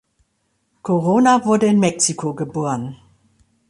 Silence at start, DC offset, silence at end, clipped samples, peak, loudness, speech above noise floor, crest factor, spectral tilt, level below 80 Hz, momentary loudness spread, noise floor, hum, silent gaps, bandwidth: 0.85 s; under 0.1%; 0.75 s; under 0.1%; -2 dBFS; -17 LUFS; 51 dB; 16 dB; -5 dB/octave; -60 dBFS; 12 LU; -68 dBFS; none; none; 11.5 kHz